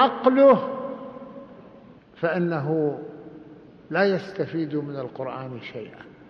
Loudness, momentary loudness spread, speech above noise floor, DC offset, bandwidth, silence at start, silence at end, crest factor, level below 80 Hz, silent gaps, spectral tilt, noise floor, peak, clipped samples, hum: -23 LUFS; 25 LU; 26 dB; under 0.1%; 6 kHz; 0 s; 0.2 s; 20 dB; -66 dBFS; none; -8.5 dB/octave; -49 dBFS; -4 dBFS; under 0.1%; none